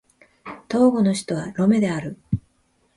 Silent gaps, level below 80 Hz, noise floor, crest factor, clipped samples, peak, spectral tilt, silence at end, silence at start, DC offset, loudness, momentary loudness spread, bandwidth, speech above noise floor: none; -50 dBFS; -64 dBFS; 16 dB; under 0.1%; -6 dBFS; -6.5 dB/octave; 0.6 s; 0.45 s; under 0.1%; -21 LUFS; 20 LU; 11.5 kHz; 45 dB